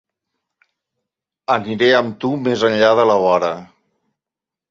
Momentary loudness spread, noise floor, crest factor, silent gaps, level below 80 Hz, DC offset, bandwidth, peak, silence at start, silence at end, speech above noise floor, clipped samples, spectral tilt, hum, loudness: 10 LU; -87 dBFS; 18 dB; none; -60 dBFS; under 0.1%; 7.6 kHz; 0 dBFS; 1.5 s; 1.05 s; 72 dB; under 0.1%; -5.5 dB/octave; none; -16 LUFS